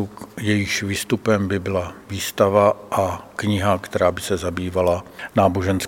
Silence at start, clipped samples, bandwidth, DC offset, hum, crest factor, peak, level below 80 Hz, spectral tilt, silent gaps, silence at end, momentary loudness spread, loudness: 0 s; under 0.1%; 17 kHz; under 0.1%; none; 20 dB; -2 dBFS; -48 dBFS; -5.5 dB/octave; none; 0 s; 9 LU; -21 LUFS